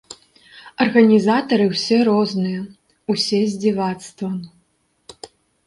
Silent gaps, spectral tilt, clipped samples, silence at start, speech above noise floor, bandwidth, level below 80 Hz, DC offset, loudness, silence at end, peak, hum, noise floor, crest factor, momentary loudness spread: none; -5.5 dB/octave; under 0.1%; 0.1 s; 47 dB; 11.5 kHz; -62 dBFS; under 0.1%; -18 LUFS; 0.4 s; 0 dBFS; none; -65 dBFS; 18 dB; 19 LU